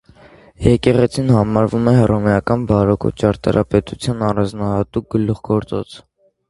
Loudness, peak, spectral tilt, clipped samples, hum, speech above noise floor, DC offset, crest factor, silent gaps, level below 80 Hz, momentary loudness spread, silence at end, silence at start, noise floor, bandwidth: -17 LUFS; 0 dBFS; -8 dB/octave; under 0.1%; none; 29 dB; under 0.1%; 16 dB; none; -36 dBFS; 7 LU; 0.5 s; 0.6 s; -45 dBFS; 11.5 kHz